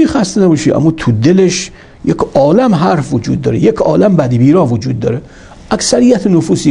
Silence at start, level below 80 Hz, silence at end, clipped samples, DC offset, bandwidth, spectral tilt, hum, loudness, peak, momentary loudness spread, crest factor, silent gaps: 0 s; -38 dBFS; 0 s; 0.3%; under 0.1%; 11 kHz; -6 dB/octave; none; -11 LUFS; 0 dBFS; 8 LU; 10 dB; none